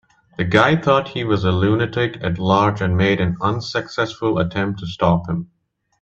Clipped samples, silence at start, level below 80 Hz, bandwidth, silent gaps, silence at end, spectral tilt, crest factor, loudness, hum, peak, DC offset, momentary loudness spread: under 0.1%; 0.4 s; -46 dBFS; 7.8 kHz; none; 0.55 s; -7 dB/octave; 18 dB; -19 LUFS; none; 0 dBFS; under 0.1%; 9 LU